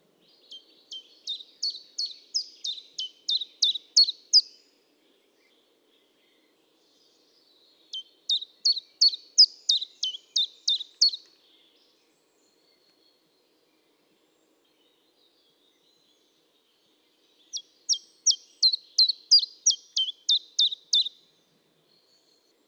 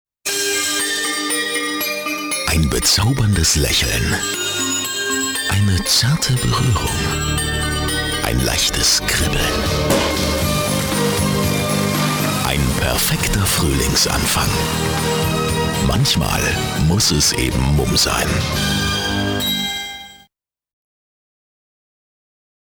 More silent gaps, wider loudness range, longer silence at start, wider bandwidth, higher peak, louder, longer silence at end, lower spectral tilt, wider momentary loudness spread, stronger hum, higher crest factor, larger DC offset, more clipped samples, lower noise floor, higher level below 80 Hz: neither; first, 10 LU vs 3 LU; first, 0.5 s vs 0.25 s; second, 17.5 kHz vs over 20 kHz; second, -8 dBFS vs 0 dBFS; second, -23 LUFS vs -17 LUFS; second, 1.6 s vs 2.65 s; second, 5 dB/octave vs -3.5 dB/octave; first, 18 LU vs 5 LU; neither; about the same, 22 dB vs 18 dB; neither; neither; first, -67 dBFS vs -61 dBFS; second, under -90 dBFS vs -28 dBFS